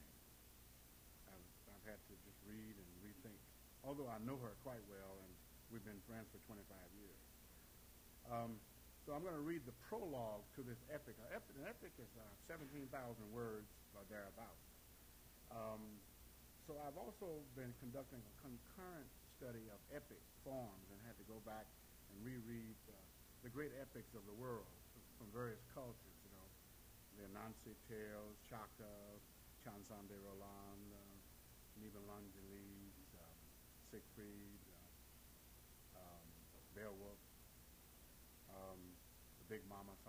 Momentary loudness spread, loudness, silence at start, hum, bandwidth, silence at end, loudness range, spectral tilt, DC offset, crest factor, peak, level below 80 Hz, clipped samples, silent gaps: 13 LU; -57 LUFS; 0 s; none; over 20 kHz; 0 s; 8 LU; -5.5 dB/octave; under 0.1%; 22 dB; -34 dBFS; -70 dBFS; under 0.1%; none